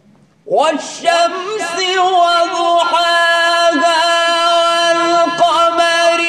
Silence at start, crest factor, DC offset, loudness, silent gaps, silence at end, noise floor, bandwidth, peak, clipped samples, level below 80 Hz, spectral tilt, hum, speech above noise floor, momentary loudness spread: 0.45 s; 12 dB; under 0.1%; -12 LUFS; none; 0 s; -40 dBFS; 13.5 kHz; 0 dBFS; under 0.1%; -62 dBFS; -1 dB/octave; none; 26 dB; 5 LU